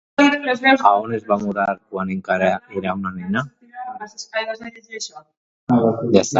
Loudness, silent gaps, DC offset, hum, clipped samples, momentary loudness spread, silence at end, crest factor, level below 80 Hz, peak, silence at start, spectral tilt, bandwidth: -19 LUFS; 5.37-5.67 s; under 0.1%; none; under 0.1%; 17 LU; 0 s; 20 dB; -56 dBFS; 0 dBFS; 0.2 s; -5 dB/octave; 8 kHz